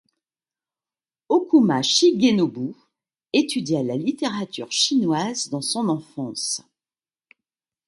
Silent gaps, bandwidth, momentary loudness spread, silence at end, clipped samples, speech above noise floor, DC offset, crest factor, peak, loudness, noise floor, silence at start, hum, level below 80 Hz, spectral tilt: none; 11.5 kHz; 11 LU; 1.3 s; under 0.1%; over 69 dB; under 0.1%; 18 dB; -4 dBFS; -21 LUFS; under -90 dBFS; 1.3 s; none; -70 dBFS; -4 dB/octave